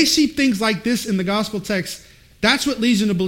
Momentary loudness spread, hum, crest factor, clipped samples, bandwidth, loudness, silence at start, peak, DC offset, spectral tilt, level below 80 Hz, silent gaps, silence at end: 7 LU; none; 18 dB; under 0.1%; 16.5 kHz; -19 LUFS; 0 s; -2 dBFS; under 0.1%; -4 dB/octave; -48 dBFS; none; 0 s